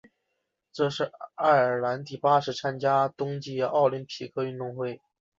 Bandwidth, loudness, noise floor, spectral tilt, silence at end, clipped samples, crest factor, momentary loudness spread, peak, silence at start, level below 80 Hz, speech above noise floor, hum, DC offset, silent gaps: 7.8 kHz; -27 LUFS; -80 dBFS; -6 dB/octave; 0.4 s; under 0.1%; 18 dB; 12 LU; -10 dBFS; 0.75 s; -72 dBFS; 54 dB; none; under 0.1%; none